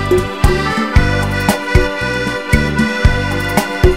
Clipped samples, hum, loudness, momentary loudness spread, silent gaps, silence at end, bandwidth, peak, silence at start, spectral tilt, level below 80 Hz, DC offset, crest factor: 0.1%; none; -15 LUFS; 3 LU; none; 0 s; 16.5 kHz; 0 dBFS; 0 s; -5.5 dB/octave; -18 dBFS; 1%; 14 dB